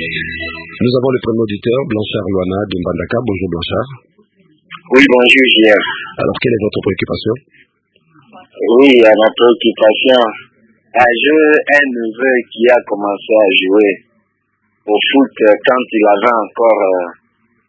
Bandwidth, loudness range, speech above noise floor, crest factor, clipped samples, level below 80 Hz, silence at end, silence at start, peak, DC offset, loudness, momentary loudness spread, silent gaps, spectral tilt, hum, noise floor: 8 kHz; 6 LU; 52 dB; 12 dB; 0.2%; -44 dBFS; 0.55 s; 0 s; 0 dBFS; under 0.1%; -11 LUFS; 12 LU; none; -6 dB/octave; none; -64 dBFS